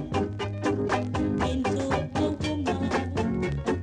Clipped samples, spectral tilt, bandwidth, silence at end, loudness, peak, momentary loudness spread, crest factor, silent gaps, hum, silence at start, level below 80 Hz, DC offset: under 0.1%; -6.5 dB/octave; 10.5 kHz; 0 s; -28 LUFS; -14 dBFS; 2 LU; 14 dB; none; none; 0 s; -42 dBFS; under 0.1%